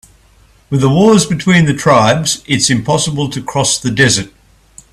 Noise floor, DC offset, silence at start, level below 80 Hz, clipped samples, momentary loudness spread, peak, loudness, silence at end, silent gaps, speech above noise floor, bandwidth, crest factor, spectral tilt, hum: -47 dBFS; under 0.1%; 0.7 s; -42 dBFS; under 0.1%; 7 LU; 0 dBFS; -12 LUFS; 0.65 s; none; 36 dB; 14 kHz; 12 dB; -4 dB/octave; none